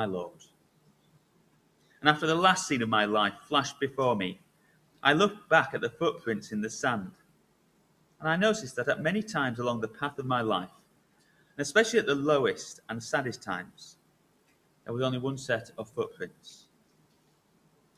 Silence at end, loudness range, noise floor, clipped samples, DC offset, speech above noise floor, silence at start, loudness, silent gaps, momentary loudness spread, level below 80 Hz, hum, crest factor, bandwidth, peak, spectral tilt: 1.4 s; 8 LU; -67 dBFS; under 0.1%; under 0.1%; 38 dB; 0 s; -29 LUFS; none; 15 LU; -68 dBFS; none; 26 dB; 14.5 kHz; -4 dBFS; -4 dB/octave